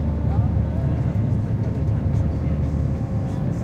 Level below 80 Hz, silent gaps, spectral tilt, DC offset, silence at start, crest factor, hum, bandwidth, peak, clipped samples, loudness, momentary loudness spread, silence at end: -28 dBFS; none; -10 dB/octave; under 0.1%; 0 s; 14 dB; none; 7 kHz; -8 dBFS; under 0.1%; -23 LUFS; 3 LU; 0 s